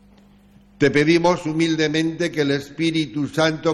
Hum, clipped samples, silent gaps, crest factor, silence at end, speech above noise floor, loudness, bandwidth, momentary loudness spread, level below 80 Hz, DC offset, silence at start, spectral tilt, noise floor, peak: 50 Hz at -55 dBFS; under 0.1%; none; 16 dB; 0 s; 31 dB; -20 LUFS; 12 kHz; 6 LU; -54 dBFS; under 0.1%; 0.8 s; -5.5 dB/octave; -51 dBFS; -4 dBFS